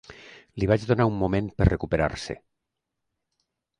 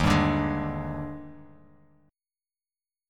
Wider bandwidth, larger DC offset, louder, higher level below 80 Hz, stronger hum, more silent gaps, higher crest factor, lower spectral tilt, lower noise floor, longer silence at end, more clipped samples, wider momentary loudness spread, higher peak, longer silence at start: second, 10.5 kHz vs 14 kHz; neither; first, -25 LUFS vs -28 LUFS; about the same, -38 dBFS vs -42 dBFS; neither; neither; about the same, 22 dB vs 22 dB; about the same, -7.5 dB/octave vs -6.5 dB/octave; second, -82 dBFS vs under -90 dBFS; second, 1.45 s vs 1.65 s; neither; about the same, 17 LU vs 19 LU; first, -4 dBFS vs -8 dBFS; about the same, 0.1 s vs 0 s